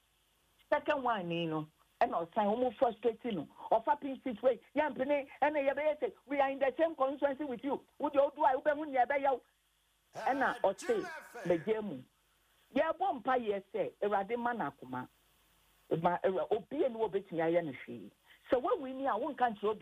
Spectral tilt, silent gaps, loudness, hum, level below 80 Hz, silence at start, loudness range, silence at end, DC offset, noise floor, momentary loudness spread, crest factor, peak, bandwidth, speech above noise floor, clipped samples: -6 dB/octave; none; -34 LUFS; none; -72 dBFS; 0.7 s; 3 LU; 0 s; under 0.1%; -74 dBFS; 9 LU; 16 dB; -18 dBFS; 13.5 kHz; 41 dB; under 0.1%